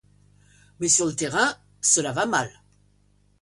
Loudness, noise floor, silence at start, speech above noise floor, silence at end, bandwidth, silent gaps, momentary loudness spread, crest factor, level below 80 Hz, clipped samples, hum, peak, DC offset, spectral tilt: -22 LUFS; -62 dBFS; 0.8 s; 39 dB; 0.9 s; 11.5 kHz; none; 7 LU; 20 dB; -62 dBFS; under 0.1%; 50 Hz at -55 dBFS; -6 dBFS; under 0.1%; -2 dB/octave